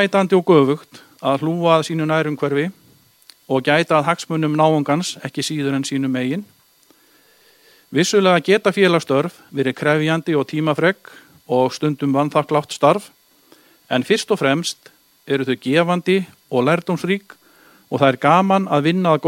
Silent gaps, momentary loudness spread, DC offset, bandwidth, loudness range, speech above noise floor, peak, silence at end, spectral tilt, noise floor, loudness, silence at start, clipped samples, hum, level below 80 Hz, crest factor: none; 9 LU; under 0.1%; 16.5 kHz; 3 LU; 37 dB; 0 dBFS; 0 s; -5.5 dB/octave; -55 dBFS; -18 LUFS; 0 s; under 0.1%; none; -66 dBFS; 18 dB